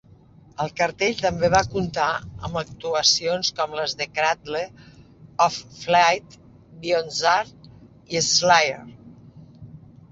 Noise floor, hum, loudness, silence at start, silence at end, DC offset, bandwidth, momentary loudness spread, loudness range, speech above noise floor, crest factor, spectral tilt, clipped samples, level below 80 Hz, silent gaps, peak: -50 dBFS; none; -22 LUFS; 0.6 s; 0.35 s; under 0.1%; 8 kHz; 13 LU; 2 LU; 28 dB; 22 dB; -2.5 dB/octave; under 0.1%; -52 dBFS; none; -2 dBFS